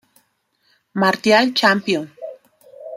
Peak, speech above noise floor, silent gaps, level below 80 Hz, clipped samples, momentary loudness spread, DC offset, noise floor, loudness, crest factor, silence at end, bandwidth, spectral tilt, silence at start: -2 dBFS; 49 dB; none; -68 dBFS; under 0.1%; 22 LU; under 0.1%; -65 dBFS; -16 LUFS; 18 dB; 0 s; 15.5 kHz; -4.5 dB/octave; 0.95 s